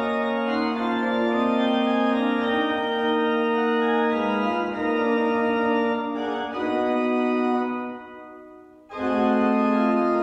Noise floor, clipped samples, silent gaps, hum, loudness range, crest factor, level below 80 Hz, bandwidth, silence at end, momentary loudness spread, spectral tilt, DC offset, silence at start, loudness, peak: -46 dBFS; under 0.1%; none; none; 3 LU; 14 dB; -62 dBFS; 7.8 kHz; 0 s; 7 LU; -6.5 dB/octave; under 0.1%; 0 s; -23 LUFS; -10 dBFS